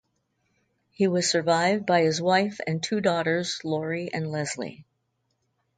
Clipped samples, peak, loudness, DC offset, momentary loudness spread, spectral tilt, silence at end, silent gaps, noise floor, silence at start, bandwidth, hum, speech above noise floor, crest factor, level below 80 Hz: under 0.1%; -8 dBFS; -25 LUFS; under 0.1%; 8 LU; -4.5 dB/octave; 0.95 s; none; -75 dBFS; 1 s; 9.6 kHz; none; 50 dB; 18 dB; -70 dBFS